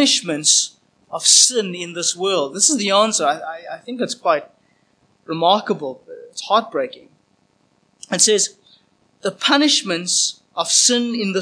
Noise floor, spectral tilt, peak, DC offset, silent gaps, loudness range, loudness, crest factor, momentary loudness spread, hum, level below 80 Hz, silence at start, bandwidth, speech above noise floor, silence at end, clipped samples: -61 dBFS; -1.5 dB/octave; 0 dBFS; under 0.1%; none; 7 LU; -16 LUFS; 20 dB; 16 LU; none; -80 dBFS; 0 s; 10.5 kHz; 43 dB; 0 s; under 0.1%